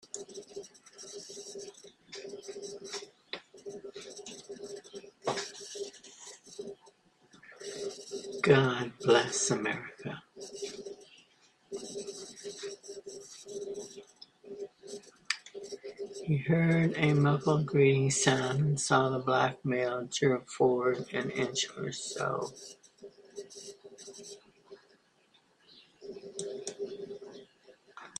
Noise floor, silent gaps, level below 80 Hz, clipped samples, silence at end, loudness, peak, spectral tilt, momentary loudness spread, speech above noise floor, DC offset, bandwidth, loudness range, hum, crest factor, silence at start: -68 dBFS; none; -70 dBFS; under 0.1%; 0.1 s; -31 LUFS; -8 dBFS; -4.5 dB/octave; 22 LU; 39 dB; under 0.1%; 11 kHz; 17 LU; none; 26 dB; 0.15 s